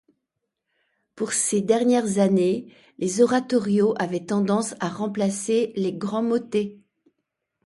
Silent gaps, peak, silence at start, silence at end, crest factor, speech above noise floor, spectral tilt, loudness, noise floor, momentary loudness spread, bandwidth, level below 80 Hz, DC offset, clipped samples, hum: none; -6 dBFS; 1.15 s; 0.9 s; 18 dB; 59 dB; -5 dB/octave; -23 LUFS; -81 dBFS; 8 LU; 11.5 kHz; -68 dBFS; under 0.1%; under 0.1%; none